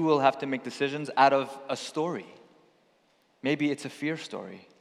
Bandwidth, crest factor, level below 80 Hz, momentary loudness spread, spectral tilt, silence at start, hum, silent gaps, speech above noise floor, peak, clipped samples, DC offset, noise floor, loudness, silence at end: 13 kHz; 22 dB; under -90 dBFS; 15 LU; -5 dB/octave; 0 s; none; none; 39 dB; -6 dBFS; under 0.1%; under 0.1%; -67 dBFS; -28 LUFS; 0.2 s